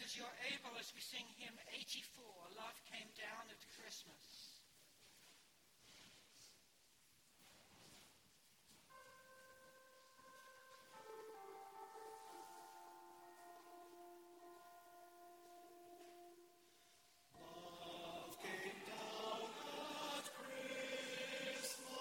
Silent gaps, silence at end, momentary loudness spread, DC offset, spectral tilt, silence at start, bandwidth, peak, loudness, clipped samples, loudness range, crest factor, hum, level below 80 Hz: none; 0 s; 20 LU; under 0.1%; -1.5 dB/octave; 0 s; 17 kHz; -32 dBFS; -52 LUFS; under 0.1%; 17 LU; 22 dB; none; -88 dBFS